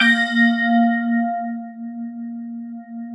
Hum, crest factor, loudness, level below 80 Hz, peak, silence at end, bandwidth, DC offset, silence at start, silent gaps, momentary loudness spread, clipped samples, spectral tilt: none; 18 dB; -18 LUFS; -80 dBFS; -4 dBFS; 0 s; 10 kHz; under 0.1%; 0 s; none; 17 LU; under 0.1%; -5 dB/octave